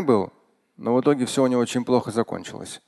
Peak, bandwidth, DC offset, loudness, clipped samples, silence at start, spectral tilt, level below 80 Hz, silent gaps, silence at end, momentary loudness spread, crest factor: -6 dBFS; 12.5 kHz; under 0.1%; -23 LUFS; under 0.1%; 0 s; -5.5 dB/octave; -62 dBFS; none; 0.1 s; 12 LU; 18 dB